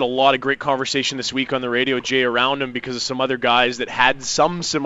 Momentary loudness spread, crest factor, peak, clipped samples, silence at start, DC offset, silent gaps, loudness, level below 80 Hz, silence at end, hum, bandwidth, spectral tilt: 6 LU; 20 dB; 0 dBFS; under 0.1%; 0 s; under 0.1%; none; -19 LUFS; -52 dBFS; 0 s; none; 8 kHz; -3 dB/octave